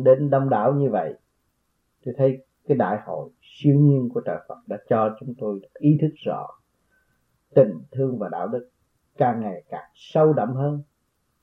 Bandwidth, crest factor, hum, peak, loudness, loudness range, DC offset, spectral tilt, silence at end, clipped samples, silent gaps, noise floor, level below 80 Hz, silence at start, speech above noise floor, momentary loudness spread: 4 kHz; 20 dB; none; -4 dBFS; -23 LUFS; 3 LU; under 0.1%; -10.5 dB/octave; 0.6 s; under 0.1%; none; -71 dBFS; -70 dBFS; 0 s; 50 dB; 16 LU